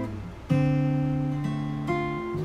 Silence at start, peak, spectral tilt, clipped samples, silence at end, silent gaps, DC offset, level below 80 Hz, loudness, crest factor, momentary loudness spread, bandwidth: 0 s; -12 dBFS; -8.5 dB/octave; under 0.1%; 0 s; none; under 0.1%; -46 dBFS; -27 LUFS; 14 dB; 6 LU; 8.6 kHz